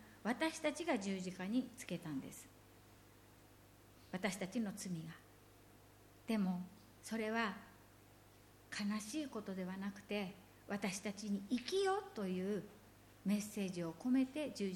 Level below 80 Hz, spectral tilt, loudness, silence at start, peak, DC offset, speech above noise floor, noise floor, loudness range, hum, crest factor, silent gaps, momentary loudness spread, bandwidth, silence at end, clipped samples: -74 dBFS; -5 dB/octave; -42 LUFS; 0 s; -24 dBFS; under 0.1%; 23 dB; -64 dBFS; 6 LU; 50 Hz at -70 dBFS; 18 dB; none; 16 LU; 17.5 kHz; 0 s; under 0.1%